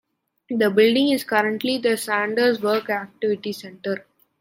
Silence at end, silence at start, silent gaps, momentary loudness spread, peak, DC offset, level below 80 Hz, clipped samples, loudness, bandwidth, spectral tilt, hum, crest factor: 0.4 s; 0.5 s; none; 12 LU; -4 dBFS; under 0.1%; -74 dBFS; under 0.1%; -21 LUFS; 16.5 kHz; -4.5 dB/octave; none; 18 dB